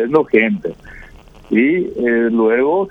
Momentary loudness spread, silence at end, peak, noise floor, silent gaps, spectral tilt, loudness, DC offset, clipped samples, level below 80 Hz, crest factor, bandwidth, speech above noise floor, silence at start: 9 LU; 0 s; 0 dBFS; -40 dBFS; none; -8.5 dB/octave; -15 LUFS; under 0.1%; under 0.1%; -46 dBFS; 16 dB; 5 kHz; 25 dB; 0 s